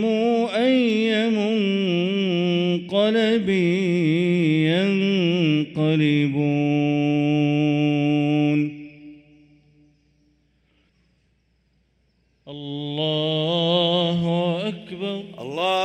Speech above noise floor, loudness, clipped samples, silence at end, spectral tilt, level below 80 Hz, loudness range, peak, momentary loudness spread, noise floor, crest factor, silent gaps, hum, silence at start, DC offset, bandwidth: 46 dB; -21 LUFS; under 0.1%; 0 s; -7 dB/octave; -64 dBFS; 8 LU; -8 dBFS; 10 LU; -65 dBFS; 14 dB; none; none; 0 s; under 0.1%; 9 kHz